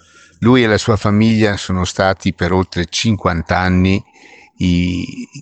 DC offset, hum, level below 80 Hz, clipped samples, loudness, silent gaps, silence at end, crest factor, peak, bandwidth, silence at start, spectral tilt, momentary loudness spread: under 0.1%; none; -38 dBFS; under 0.1%; -15 LUFS; none; 0 s; 16 dB; 0 dBFS; 8.8 kHz; 0.4 s; -6 dB/octave; 7 LU